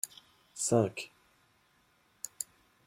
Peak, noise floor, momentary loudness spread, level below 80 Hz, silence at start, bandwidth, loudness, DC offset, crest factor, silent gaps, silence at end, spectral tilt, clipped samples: -12 dBFS; -70 dBFS; 20 LU; -76 dBFS; 0.05 s; 16.5 kHz; -34 LUFS; under 0.1%; 24 dB; none; 0.45 s; -4.5 dB/octave; under 0.1%